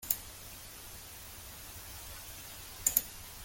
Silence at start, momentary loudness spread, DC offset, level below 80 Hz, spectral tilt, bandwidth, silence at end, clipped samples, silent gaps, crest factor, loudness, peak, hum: 0 s; 17 LU; under 0.1%; -56 dBFS; -0.5 dB/octave; 17 kHz; 0 s; under 0.1%; none; 36 dB; -38 LUFS; -6 dBFS; none